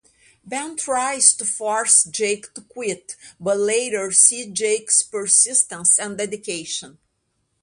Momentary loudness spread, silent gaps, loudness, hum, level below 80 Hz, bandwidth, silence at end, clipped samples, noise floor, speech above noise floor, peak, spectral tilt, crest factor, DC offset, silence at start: 15 LU; none; -17 LUFS; none; -68 dBFS; 11.5 kHz; 0.75 s; under 0.1%; -71 dBFS; 51 dB; 0 dBFS; -0.5 dB/octave; 22 dB; under 0.1%; 0.45 s